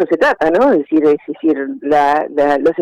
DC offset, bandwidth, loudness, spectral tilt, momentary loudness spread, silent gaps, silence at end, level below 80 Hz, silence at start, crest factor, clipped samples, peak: under 0.1%; 9.8 kHz; -14 LUFS; -6.5 dB/octave; 5 LU; none; 0 s; -50 dBFS; 0 s; 8 dB; under 0.1%; -4 dBFS